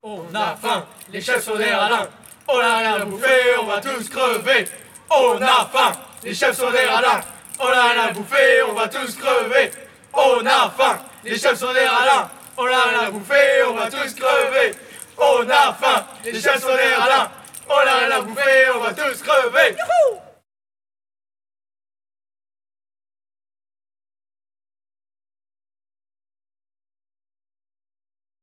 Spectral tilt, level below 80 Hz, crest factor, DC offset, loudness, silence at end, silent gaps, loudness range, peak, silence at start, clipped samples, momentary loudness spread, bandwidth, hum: -1.5 dB/octave; -68 dBFS; 18 dB; under 0.1%; -17 LUFS; 8.2 s; none; 2 LU; -2 dBFS; 0.05 s; under 0.1%; 11 LU; 17.5 kHz; none